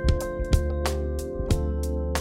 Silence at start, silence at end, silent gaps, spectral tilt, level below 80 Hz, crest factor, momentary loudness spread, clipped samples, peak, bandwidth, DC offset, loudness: 0 s; 0 s; none; -6 dB/octave; -28 dBFS; 18 dB; 4 LU; under 0.1%; -6 dBFS; 16 kHz; under 0.1%; -27 LUFS